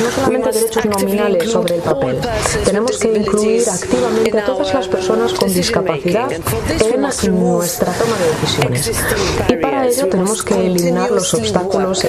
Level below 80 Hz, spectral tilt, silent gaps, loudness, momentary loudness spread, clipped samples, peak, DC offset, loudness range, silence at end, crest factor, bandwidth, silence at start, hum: -36 dBFS; -4.5 dB/octave; none; -15 LUFS; 2 LU; under 0.1%; 0 dBFS; under 0.1%; 1 LU; 0 s; 14 dB; 15 kHz; 0 s; none